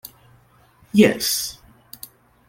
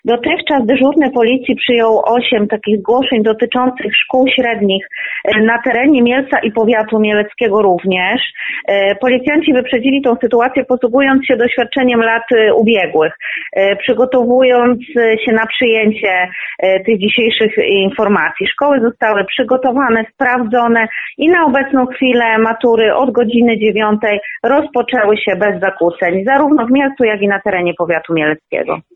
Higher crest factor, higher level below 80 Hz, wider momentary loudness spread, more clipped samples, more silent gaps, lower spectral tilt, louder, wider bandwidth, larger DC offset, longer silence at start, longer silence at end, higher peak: first, 22 dB vs 10 dB; second, -58 dBFS vs -52 dBFS; first, 24 LU vs 4 LU; neither; neither; second, -4 dB/octave vs -7.5 dB/octave; second, -19 LUFS vs -12 LUFS; first, 17 kHz vs 4.1 kHz; neither; first, 0.95 s vs 0.05 s; first, 0.95 s vs 0.15 s; about the same, -2 dBFS vs -2 dBFS